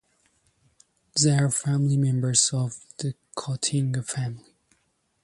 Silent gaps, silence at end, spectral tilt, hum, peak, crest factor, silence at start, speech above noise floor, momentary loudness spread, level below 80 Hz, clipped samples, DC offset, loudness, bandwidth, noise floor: none; 0.85 s; -4 dB/octave; none; -6 dBFS; 20 dB; 1.15 s; 46 dB; 12 LU; -62 dBFS; under 0.1%; under 0.1%; -25 LUFS; 11.5 kHz; -71 dBFS